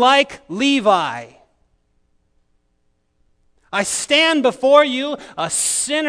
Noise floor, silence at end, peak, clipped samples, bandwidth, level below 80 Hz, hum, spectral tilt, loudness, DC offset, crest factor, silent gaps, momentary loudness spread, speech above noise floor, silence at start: -64 dBFS; 0 s; 0 dBFS; under 0.1%; 11 kHz; -60 dBFS; none; -1.5 dB/octave; -16 LUFS; under 0.1%; 18 dB; none; 12 LU; 48 dB; 0 s